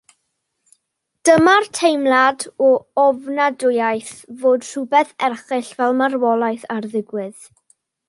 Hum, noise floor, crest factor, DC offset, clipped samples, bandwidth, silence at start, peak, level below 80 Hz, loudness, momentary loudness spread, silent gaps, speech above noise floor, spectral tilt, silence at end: none; -73 dBFS; 16 dB; under 0.1%; under 0.1%; 11.5 kHz; 1.25 s; -2 dBFS; -64 dBFS; -17 LUFS; 11 LU; none; 56 dB; -3.5 dB/octave; 0.75 s